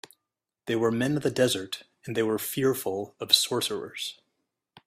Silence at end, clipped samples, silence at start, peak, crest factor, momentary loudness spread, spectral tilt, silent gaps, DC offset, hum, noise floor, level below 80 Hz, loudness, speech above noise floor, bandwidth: 0.75 s; under 0.1%; 0.65 s; -4 dBFS; 24 dB; 14 LU; -3.5 dB/octave; none; under 0.1%; none; -86 dBFS; -68 dBFS; -27 LUFS; 59 dB; 16 kHz